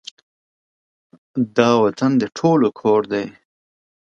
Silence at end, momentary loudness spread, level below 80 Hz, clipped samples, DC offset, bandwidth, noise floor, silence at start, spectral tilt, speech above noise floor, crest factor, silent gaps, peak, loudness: 0.85 s; 12 LU; -64 dBFS; under 0.1%; under 0.1%; 7.8 kHz; under -90 dBFS; 1.35 s; -6.5 dB/octave; over 73 dB; 20 dB; none; 0 dBFS; -18 LUFS